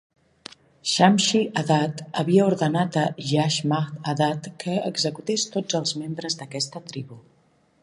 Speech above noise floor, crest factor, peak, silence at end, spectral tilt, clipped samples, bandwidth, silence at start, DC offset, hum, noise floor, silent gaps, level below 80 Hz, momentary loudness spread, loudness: 39 dB; 22 dB; -2 dBFS; 0.65 s; -4.5 dB/octave; under 0.1%; 11.5 kHz; 0.85 s; under 0.1%; none; -62 dBFS; none; -68 dBFS; 16 LU; -23 LUFS